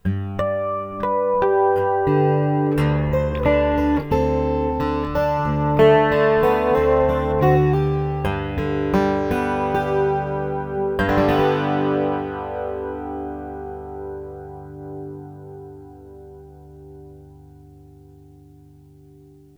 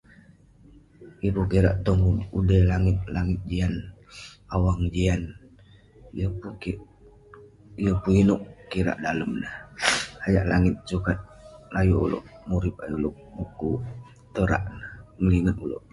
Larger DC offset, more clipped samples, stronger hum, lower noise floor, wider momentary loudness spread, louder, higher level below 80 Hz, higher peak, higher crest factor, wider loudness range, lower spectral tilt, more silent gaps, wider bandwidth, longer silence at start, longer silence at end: neither; neither; neither; second, -47 dBFS vs -53 dBFS; about the same, 17 LU vs 16 LU; first, -20 LUFS vs -25 LUFS; about the same, -36 dBFS vs -36 dBFS; about the same, -4 dBFS vs -4 dBFS; about the same, 18 dB vs 22 dB; first, 18 LU vs 5 LU; first, -8.5 dB/octave vs -6.5 dB/octave; neither; first, 19.5 kHz vs 11.5 kHz; second, 0.05 s vs 1 s; first, 1.85 s vs 0.15 s